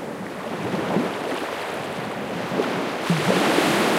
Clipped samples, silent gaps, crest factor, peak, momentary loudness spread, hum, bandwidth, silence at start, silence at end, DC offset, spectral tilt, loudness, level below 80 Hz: under 0.1%; none; 18 dB; -6 dBFS; 10 LU; none; 16 kHz; 0 s; 0 s; under 0.1%; -4.5 dB/octave; -24 LUFS; -62 dBFS